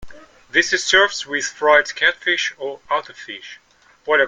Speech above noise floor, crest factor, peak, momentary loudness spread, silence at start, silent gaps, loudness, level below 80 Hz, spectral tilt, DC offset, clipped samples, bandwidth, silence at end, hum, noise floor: 19 dB; 20 dB; 0 dBFS; 19 LU; 0 s; none; -17 LUFS; -54 dBFS; -0.5 dB/octave; under 0.1%; under 0.1%; 9.6 kHz; 0 s; none; -38 dBFS